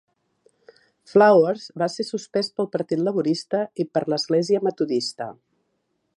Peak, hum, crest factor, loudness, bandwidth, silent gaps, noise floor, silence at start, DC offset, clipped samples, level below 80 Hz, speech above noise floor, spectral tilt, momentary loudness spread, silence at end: -4 dBFS; none; 20 dB; -22 LUFS; 11.5 kHz; none; -73 dBFS; 1.1 s; under 0.1%; under 0.1%; -74 dBFS; 51 dB; -5.5 dB/octave; 11 LU; 0.85 s